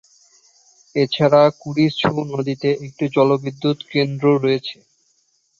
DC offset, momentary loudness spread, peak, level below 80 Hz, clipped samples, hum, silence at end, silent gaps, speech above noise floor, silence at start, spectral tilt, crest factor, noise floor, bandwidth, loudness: under 0.1%; 9 LU; -2 dBFS; -60 dBFS; under 0.1%; none; 0.85 s; none; 46 dB; 0.95 s; -7 dB/octave; 18 dB; -64 dBFS; 7.4 kHz; -18 LUFS